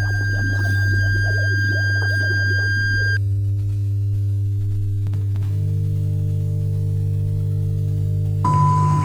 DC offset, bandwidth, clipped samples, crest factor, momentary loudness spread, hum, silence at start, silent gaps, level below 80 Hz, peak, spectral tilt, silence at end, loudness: under 0.1%; 8.8 kHz; under 0.1%; 14 dB; 4 LU; none; 0 s; none; -36 dBFS; -6 dBFS; -6.5 dB/octave; 0 s; -20 LUFS